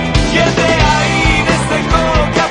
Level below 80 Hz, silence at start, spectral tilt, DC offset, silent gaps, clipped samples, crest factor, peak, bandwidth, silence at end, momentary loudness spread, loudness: -20 dBFS; 0 s; -4.5 dB/octave; under 0.1%; none; under 0.1%; 12 dB; 0 dBFS; 10.5 kHz; 0 s; 2 LU; -12 LUFS